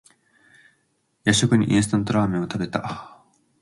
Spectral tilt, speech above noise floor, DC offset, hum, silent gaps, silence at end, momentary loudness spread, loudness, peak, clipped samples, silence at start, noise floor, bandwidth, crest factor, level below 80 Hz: -5 dB/octave; 48 dB; under 0.1%; none; none; 0.55 s; 11 LU; -22 LUFS; -2 dBFS; under 0.1%; 1.25 s; -69 dBFS; 11.5 kHz; 20 dB; -52 dBFS